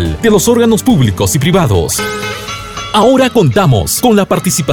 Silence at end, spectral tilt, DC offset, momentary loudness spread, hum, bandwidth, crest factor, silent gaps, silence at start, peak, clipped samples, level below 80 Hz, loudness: 0 s; -5 dB/octave; under 0.1%; 10 LU; none; 20 kHz; 10 dB; none; 0 s; 0 dBFS; under 0.1%; -30 dBFS; -10 LUFS